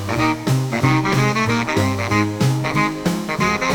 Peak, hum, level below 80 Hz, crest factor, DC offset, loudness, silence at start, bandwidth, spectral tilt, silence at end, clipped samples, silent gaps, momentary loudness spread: -4 dBFS; none; -44 dBFS; 14 dB; under 0.1%; -18 LUFS; 0 s; 19.5 kHz; -5.5 dB/octave; 0 s; under 0.1%; none; 3 LU